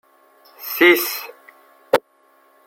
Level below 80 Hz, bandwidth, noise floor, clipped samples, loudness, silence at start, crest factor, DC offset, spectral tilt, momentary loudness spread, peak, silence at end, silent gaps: -70 dBFS; 16.5 kHz; -57 dBFS; under 0.1%; -17 LUFS; 0.6 s; 22 dB; under 0.1%; -2.5 dB/octave; 20 LU; 0 dBFS; 0.65 s; none